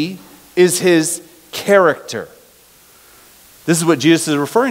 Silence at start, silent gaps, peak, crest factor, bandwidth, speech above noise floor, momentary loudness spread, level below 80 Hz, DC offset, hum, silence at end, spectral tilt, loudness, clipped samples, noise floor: 0 s; none; 0 dBFS; 16 dB; 16 kHz; 33 dB; 15 LU; -62 dBFS; under 0.1%; none; 0 s; -4 dB/octave; -15 LUFS; under 0.1%; -47 dBFS